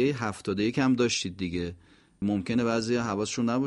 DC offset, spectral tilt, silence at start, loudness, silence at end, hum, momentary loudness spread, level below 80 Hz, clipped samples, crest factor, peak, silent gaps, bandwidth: under 0.1%; -5 dB/octave; 0 s; -28 LUFS; 0 s; none; 7 LU; -56 dBFS; under 0.1%; 16 dB; -12 dBFS; none; 11.5 kHz